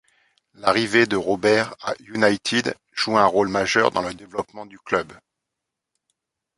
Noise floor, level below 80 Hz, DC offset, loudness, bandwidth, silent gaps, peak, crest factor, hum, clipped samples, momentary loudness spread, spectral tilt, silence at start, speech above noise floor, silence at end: -83 dBFS; -58 dBFS; under 0.1%; -21 LUFS; 11.5 kHz; none; -2 dBFS; 20 dB; none; under 0.1%; 13 LU; -4 dB/octave; 0.6 s; 62 dB; 1.45 s